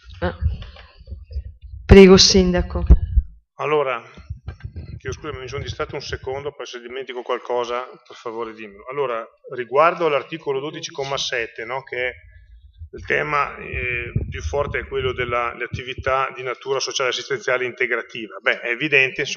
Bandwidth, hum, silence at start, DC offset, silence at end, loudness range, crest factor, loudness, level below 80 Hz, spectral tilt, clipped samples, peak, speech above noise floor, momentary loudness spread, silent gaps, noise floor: 7.4 kHz; none; 0.05 s; under 0.1%; 0 s; 13 LU; 20 dB; -20 LUFS; -30 dBFS; -4.5 dB/octave; under 0.1%; 0 dBFS; 26 dB; 19 LU; none; -46 dBFS